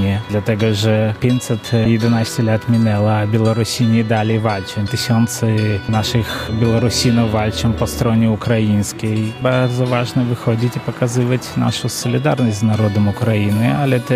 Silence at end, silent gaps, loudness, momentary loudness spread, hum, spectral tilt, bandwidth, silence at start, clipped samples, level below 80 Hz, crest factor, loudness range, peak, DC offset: 0 s; none; -16 LUFS; 4 LU; none; -6 dB/octave; 15.5 kHz; 0 s; under 0.1%; -42 dBFS; 14 dB; 2 LU; 0 dBFS; under 0.1%